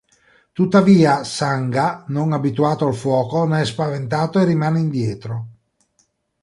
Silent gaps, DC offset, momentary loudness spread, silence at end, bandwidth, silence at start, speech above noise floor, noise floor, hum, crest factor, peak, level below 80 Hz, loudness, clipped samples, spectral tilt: none; under 0.1%; 11 LU; 0.9 s; 11.5 kHz; 0.55 s; 47 dB; -64 dBFS; none; 16 dB; -2 dBFS; -56 dBFS; -18 LUFS; under 0.1%; -7 dB/octave